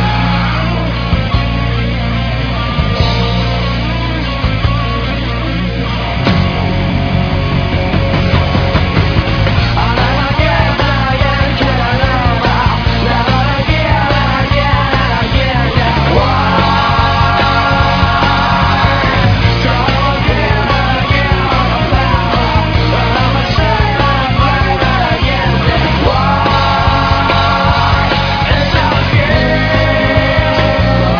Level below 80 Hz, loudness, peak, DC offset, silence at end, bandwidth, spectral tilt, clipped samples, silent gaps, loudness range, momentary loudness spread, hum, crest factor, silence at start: -18 dBFS; -12 LUFS; 0 dBFS; under 0.1%; 0 s; 5.4 kHz; -7 dB/octave; under 0.1%; none; 4 LU; 4 LU; none; 12 dB; 0 s